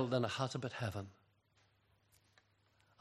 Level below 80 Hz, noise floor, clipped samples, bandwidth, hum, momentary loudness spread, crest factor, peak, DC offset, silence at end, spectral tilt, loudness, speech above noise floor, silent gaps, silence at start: -78 dBFS; -75 dBFS; under 0.1%; 13.5 kHz; none; 12 LU; 22 dB; -20 dBFS; under 0.1%; 1.9 s; -5.5 dB/octave; -40 LUFS; 35 dB; none; 0 s